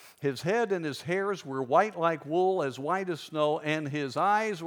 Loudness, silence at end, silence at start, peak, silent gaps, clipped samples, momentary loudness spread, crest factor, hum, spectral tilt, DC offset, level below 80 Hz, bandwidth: -29 LUFS; 0 s; 0 s; -10 dBFS; none; under 0.1%; 6 LU; 20 dB; none; -5.5 dB/octave; under 0.1%; -82 dBFS; 18.5 kHz